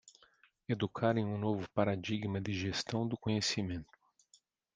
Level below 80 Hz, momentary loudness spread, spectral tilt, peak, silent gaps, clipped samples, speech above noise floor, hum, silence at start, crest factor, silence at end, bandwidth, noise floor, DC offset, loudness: -68 dBFS; 6 LU; -5.5 dB/octave; -16 dBFS; none; under 0.1%; 36 dB; none; 0.05 s; 22 dB; 0.9 s; 9.8 kHz; -70 dBFS; under 0.1%; -36 LUFS